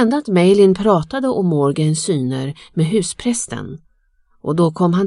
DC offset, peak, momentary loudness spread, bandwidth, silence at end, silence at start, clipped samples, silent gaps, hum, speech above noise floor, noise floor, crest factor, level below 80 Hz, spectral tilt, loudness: under 0.1%; 0 dBFS; 12 LU; 11.5 kHz; 0 s; 0 s; under 0.1%; none; none; 42 dB; -57 dBFS; 16 dB; -50 dBFS; -6 dB/octave; -17 LUFS